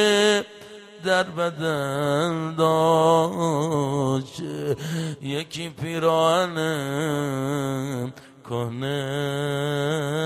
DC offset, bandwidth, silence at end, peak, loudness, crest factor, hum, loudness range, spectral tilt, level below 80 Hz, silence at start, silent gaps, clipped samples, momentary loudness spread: under 0.1%; 15.5 kHz; 0 s; -6 dBFS; -24 LUFS; 16 dB; none; 5 LU; -5 dB/octave; -62 dBFS; 0 s; none; under 0.1%; 11 LU